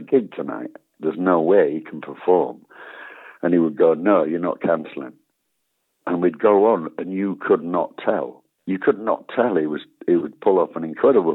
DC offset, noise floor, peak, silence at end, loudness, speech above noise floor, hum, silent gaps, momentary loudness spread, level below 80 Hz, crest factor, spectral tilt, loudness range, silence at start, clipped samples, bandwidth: under 0.1%; -73 dBFS; -4 dBFS; 0 s; -20 LUFS; 54 dB; none; none; 18 LU; -78 dBFS; 16 dB; -10 dB/octave; 2 LU; 0 s; under 0.1%; 4.1 kHz